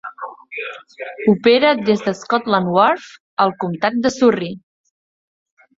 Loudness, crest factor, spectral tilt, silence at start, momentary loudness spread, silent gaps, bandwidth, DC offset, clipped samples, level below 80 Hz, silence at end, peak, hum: -17 LUFS; 18 dB; -5.5 dB/octave; 0.05 s; 17 LU; 3.20-3.37 s; 7.8 kHz; under 0.1%; under 0.1%; -60 dBFS; 1.2 s; -2 dBFS; none